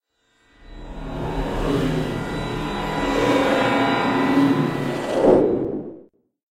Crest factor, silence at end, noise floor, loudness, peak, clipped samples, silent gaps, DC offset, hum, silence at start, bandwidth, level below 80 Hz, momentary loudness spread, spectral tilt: 20 dB; 0.5 s; -63 dBFS; -21 LUFS; -2 dBFS; under 0.1%; none; under 0.1%; none; 0.65 s; 15 kHz; -38 dBFS; 12 LU; -6.5 dB/octave